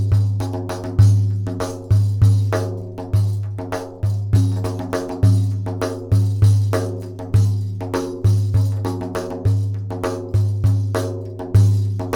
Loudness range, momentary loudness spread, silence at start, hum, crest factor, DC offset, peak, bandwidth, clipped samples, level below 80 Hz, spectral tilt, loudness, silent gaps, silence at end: 2 LU; 10 LU; 0 s; none; 16 dB; under 0.1%; -2 dBFS; 11.5 kHz; under 0.1%; -36 dBFS; -7.5 dB/octave; -20 LUFS; none; 0 s